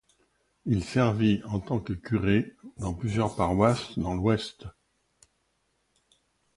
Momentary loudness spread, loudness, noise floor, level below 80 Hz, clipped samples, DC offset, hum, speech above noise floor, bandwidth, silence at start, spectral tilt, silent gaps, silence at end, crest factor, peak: 14 LU; -27 LUFS; -74 dBFS; -48 dBFS; under 0.1%; under 0.1%; none; 47 dB; 11.5 kHz; 0.65 s; -7 dB/octave; none; 1.85 s; 20 dB; -8 dBFS